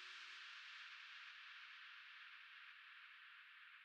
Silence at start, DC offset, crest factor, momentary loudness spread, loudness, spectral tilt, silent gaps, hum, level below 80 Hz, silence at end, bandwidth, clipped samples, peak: 0 s; under 0.1%; 14 dB; 6 LU; -57 LUFS; 4 dB/octave; none; none; under -90 dBFS; 0 s; 10 kHz; under 0.1%; -46 dBFS